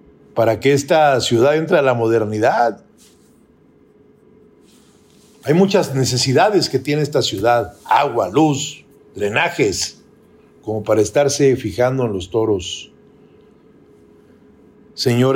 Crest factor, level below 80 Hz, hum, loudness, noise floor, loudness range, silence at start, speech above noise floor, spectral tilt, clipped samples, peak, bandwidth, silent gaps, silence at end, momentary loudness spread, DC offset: 16 dB; -56 dBFS; none; -17 LUFS; -51 dBFS; 7 LU; 0.35 s; 35 dB; -5 dB/octave; under 0.1%; -2 dBFS; 16.5 kHz; none; 0 s; 11 LU; under 0.1%